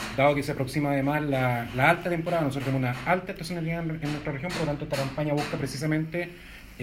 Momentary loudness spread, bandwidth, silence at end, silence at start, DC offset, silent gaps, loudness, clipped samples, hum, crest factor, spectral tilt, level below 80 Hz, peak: 8 LU; 16 kHz; 0 s; 0 s; under 0.1%; none; -27 LUFS; under 0.1%; none; 22 dB; -6 dB/octave; -50 dBFS; -6 dBFS